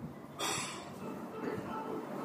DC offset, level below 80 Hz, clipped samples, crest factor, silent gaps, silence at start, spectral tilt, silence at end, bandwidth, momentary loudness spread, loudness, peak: under 0.1%; -70 dBFS; under 0.1%; 18 dB; none; 0 s; -3.5 dB/octave; 0 s; 15.5 kHz; 8 LU; -40 LUFS; -22 dBFS